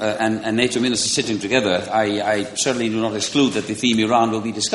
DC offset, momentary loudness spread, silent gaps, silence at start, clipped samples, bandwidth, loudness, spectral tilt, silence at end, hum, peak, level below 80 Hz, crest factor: under 0.1%; 4 LU; none; 0 s; under 0.1%; 11.5 kHz; -19 LUFS; -3.5 dB/octave; 0 s; none; -2 dBFS; -56 dBFS; 18 dB